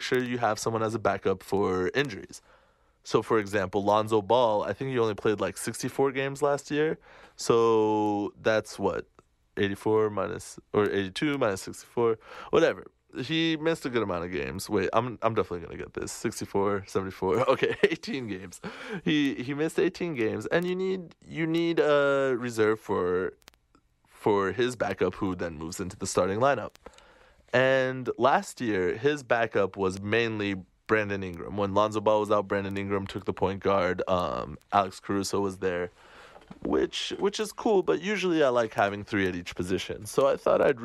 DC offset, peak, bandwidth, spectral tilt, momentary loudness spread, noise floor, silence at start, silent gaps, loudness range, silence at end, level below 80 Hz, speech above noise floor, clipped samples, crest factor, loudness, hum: under 0.1%; -8 dBFS; 13 kHz; -5 dB/octave; 10 LU; -66 dBFS; 0 s; none; 3 LU; 0 s; -58 dBFS; 39 dB; under 0.1%; 20 dB; -28 LUFS; none